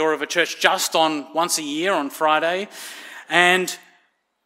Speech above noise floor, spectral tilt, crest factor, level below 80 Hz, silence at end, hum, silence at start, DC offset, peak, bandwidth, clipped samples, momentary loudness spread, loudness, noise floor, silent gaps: 43 dB; -2 dB/octave; 22 dB; -72 dBFS; 0.65 s; none; 0 s; under 0.1%; 0 dBFS; 16 kHz; under 0.1%; 17 LU; -20 LUFS; -64 dBFS; none